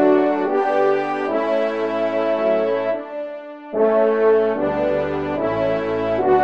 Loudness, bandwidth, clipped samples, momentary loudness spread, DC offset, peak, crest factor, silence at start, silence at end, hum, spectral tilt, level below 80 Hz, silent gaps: -19 LUFS; 6.8 kHz; under 0.1%; 8 LU; 0.3%; -4 dBFS; 14 dB; 0 s; 0 s; none; -7.5 dB/octave; -52 dBFS; none